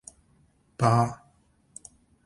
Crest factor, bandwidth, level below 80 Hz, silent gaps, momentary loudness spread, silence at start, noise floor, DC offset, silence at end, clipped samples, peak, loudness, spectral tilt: 24 dB; 11.5 kHz; -60 dBFS; none; 26 LU; 0.8 s; -64 dBFS; under 0.1%; 1.1 s; under 0.1%; -6 dBFS; -25 LUFS; -6.5 dB/octave